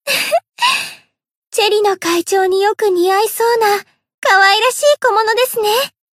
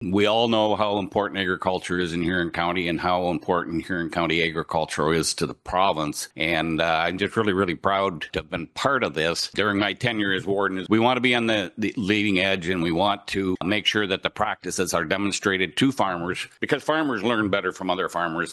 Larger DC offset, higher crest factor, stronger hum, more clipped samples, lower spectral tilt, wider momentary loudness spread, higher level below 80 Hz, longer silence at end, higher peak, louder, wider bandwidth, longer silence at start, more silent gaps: neither; second, 14 dB vs 22 dB; neither; neither; second, -0.5 dB/octave vs -4.5 dB/octave; about the same, 7 LU vs 5 LU; second, -66 dBFS vs -52 dBFS; first, 0.25 s vs 0 s; about the same, 0 dBFS vs -2 dBFS; first, -13 LUFS vs -23 LUFS; first, 16 kHz vs 12.5 kHz; about the same, 0.05 s vs 0 s; first, 1.37-1.42 s, 4.14-4.22 s vs none